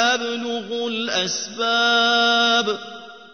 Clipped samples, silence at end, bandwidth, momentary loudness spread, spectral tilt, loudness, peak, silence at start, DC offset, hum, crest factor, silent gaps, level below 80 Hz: under 0.1%; 0.05 s; 6.6 kHz; 11 LU; -1.5 dB/octave; -19 LUFS; -4 dBFS; 0 s; 0.2%; none; 16 dB; none; -74 dBFS